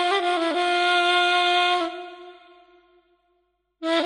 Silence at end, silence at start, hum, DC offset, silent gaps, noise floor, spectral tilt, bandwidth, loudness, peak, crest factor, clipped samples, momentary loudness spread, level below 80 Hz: 0 s; 0 s; none; under 0.1%; none; -70 dBFS; -0.5 dB/octave; 10 kHz; -21 LUFS; -10 dBFS; 14 dB; under 0.1%; 14 LU; -70 dBFS